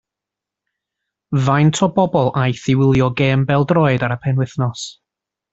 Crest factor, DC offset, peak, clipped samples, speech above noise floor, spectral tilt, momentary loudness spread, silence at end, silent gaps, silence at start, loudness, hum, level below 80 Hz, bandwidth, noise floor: 14 dB; under 0.1%; -2 dBFS; under 0.1%; 69 dB; -6.5 dB/octave; 8 LU; 0.6 s; none; 1.3 s; -16 LUFS; none; -46 dBFS; 8 kHz; -85 dBFS